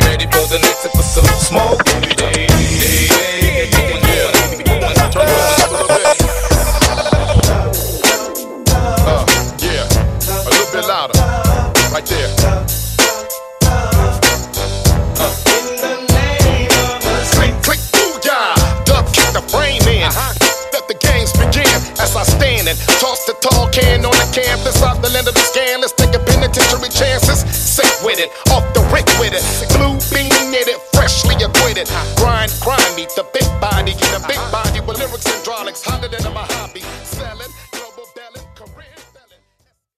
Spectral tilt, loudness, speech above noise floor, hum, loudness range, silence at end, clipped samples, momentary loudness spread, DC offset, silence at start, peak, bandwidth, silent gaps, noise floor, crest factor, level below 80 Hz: -3.5 dB/octave; -13 LUFS; 49 dB; none; 5 LU; 0.95 s; under 0.1%; 7 LU; under 0.1%; 0 s; 0 dBFS; 16 kHz; none; -62 dBFS; 14 dB; -20 dBFS